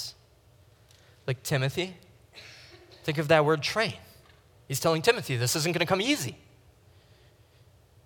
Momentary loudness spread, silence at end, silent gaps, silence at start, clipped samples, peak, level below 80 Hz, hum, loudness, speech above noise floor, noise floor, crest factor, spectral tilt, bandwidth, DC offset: 22 LU; 1.7 s; none; 0 s; under 0.1%; -6 dBFS; -64 dBFS; none; -27 LUFS; 32 dB; -59 dBFS; 24 dB; -4 dB/octave; 19 kHz; under 0.1%